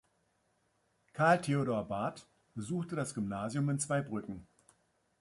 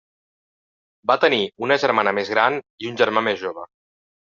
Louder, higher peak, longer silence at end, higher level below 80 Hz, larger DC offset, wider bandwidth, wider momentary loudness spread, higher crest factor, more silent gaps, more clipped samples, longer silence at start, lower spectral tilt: second, -34 LUFS vs -20 LUFS; second, -14 dBFS vs -2 dBFS; first, 0.75 s vs 0.6 s; about the same, -68 dBFS vs -68 dBFS; neither; first, 11.5 kHz vs 7.4 kHz; first, 19 LU vs 11 LU; about the same, 22 dB vs 20 dB; second, none vs 2.70-2.78 s; neither; about the same, 1.15 s vs 1.05 s; first, -6 dB/octave vs -1.5 dB/octave